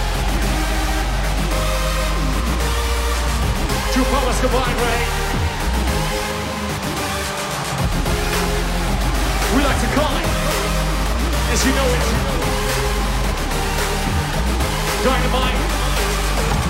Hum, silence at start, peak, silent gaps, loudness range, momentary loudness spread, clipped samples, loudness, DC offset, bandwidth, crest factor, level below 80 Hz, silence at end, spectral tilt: none; 0 s; -4 dBFS; none; 2 LU; 4 LU; under 0.1%; -19 LUFS; under 0.1%; 16.5 kHz; 14 dB; -22 dBFS; 0 s; -4 dB/octave